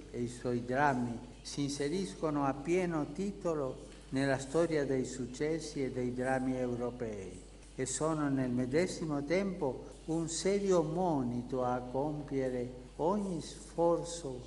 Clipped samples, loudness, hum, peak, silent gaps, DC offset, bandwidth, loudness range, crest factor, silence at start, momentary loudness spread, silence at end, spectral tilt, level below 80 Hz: under 0.1%; -35 LUFS; none; -16 dBFS; none; under 0.1%; 11.5 kHz; 2 LU; 20 dB; 0 s; 9 LU; 0 s; -5.5 dB/octave; -56 dBFS